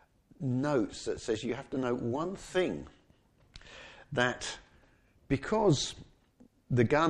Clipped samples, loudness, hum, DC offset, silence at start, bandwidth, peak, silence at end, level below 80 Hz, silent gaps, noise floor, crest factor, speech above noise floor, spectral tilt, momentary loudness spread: under 0.1%; -32 LUFS; none; under 0.1%; 0.4 s; 11 kHz; -12 dBFS; 0 s; -56 dBFS; none; -65 dBFS; 20 dB; 34 dB; -5.5 dB/octave; 21 LU